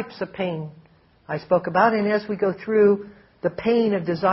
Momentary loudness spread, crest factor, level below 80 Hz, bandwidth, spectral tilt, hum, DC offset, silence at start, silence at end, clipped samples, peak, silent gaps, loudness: 13 LU; 18 dB; -60 dBFS; 6 kHz; -5.5 dB/octave; none; under 0.1%; 0 s; 0 s; under 0.1%; -4 dBFS; none; -22 LUFS